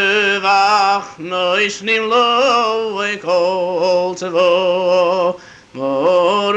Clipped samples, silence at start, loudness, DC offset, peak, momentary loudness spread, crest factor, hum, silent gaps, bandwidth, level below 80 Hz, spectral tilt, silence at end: under 0.1%; 0 s; -15 LUFS; under 0.1%; -2 dBFS; 8 LU; 12 dB; none; none; 8.8 kHz; -60 dBFS; -3.5 dB/octave; 0 s